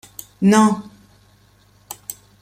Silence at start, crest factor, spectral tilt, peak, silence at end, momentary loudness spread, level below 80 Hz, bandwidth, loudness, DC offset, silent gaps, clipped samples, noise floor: 0.4 s; 18 dB; -5.5 dB/octave; -2 dBFS; 0.3 s; 23 LU; -60 dBFS; 16 kHz; -16 LUFS; under 0.1%; none; under 0.1%; -54 dBFS